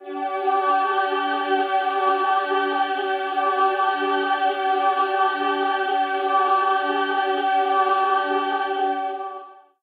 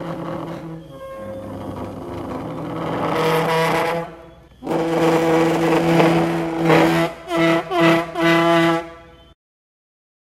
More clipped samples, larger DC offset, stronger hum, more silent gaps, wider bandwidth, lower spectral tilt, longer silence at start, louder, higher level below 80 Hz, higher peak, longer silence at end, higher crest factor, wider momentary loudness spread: neither; neither; neither; neither; second, 4.9 kHz vs 15.5 kHz; second, -3.5 dB/octave vs -6 dB/octave; about the same, 0 s vs 0 s; second, -21 LUFS vs -18 LUFS; second, under -90 dBFS vs -50 dBFS; second, -8 dBFS vs -2 dBFS; second, 0.25 s vs 1.3 s; about the same, 14 dB vs 18 dB; second, 4 LU vs 17 LU